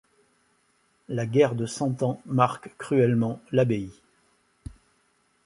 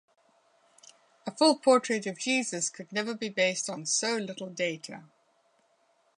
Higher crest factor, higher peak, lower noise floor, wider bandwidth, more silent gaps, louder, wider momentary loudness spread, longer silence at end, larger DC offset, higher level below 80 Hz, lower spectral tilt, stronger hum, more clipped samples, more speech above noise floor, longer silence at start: about the same, 22 dB vs 22 dB; first, -6 dBFS vs -10 dBFS; about the same, -68 dBFS vs -69 dBFS; about the same, 11.5 kHz vs 11 kHz; neither; first, -25 LUFS vs -28 LUFS; first, 22 LU vs 17 LU; second, 0.75 s vs 1.15 s; neither; first, -56 dBFS vs -84 dBFS; first, -7 dB/octave vs -2.5 dB/octave; neither; neither; about the same, 43 dB vs 40 dB; second, 1.1 s vs 1.25 s